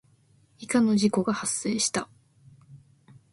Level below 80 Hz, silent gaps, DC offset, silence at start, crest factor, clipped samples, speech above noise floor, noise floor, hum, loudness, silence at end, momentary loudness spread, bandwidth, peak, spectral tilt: -66 dBFS; none; under 0.1%; 0.6 s; 18 dB; under 0.1%; 37 dB; -62 dBFS; none; -25 LUFS; 0.55 s; 14 LU; 11.5 kHz; -10 dBFS; -4 dB/octave